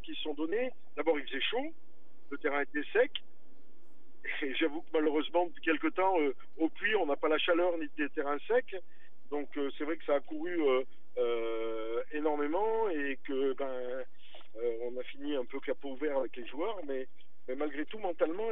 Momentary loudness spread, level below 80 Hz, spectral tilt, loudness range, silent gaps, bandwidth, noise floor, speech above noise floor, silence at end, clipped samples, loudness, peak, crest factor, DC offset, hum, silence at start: 10 LU; under -90 dBFS; -7 dB/octave; 6 LU; none; 4.1 kHz; -66 dBFS; 33 dB; 0 s; under 0.1%; -34 LUFS; -16 dBFS; 18 dB; 2%; none; 0.05 s